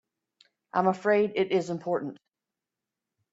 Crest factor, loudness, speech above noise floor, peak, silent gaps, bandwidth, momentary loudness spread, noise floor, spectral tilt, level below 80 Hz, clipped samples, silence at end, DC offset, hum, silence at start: 20 dB; -27 LUFS; 62 dB; -10 dBFS; none; 8 kHz; 7 LU; -89 dBFS; -6.5 dB/octave; -74 dBFS; under 0.1%; 1.2 s; under 0.1%; none; 0.75 s